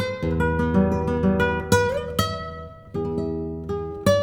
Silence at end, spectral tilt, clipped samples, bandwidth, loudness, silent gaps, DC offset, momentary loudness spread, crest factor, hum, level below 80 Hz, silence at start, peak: 0 s; -6 dB/octave; under 0.1%; 19 kHz; -23 LUFS; none; under 0.1%; 10 LU; 20 dB; none; -36 dBFS; 0 s; -4 dBFS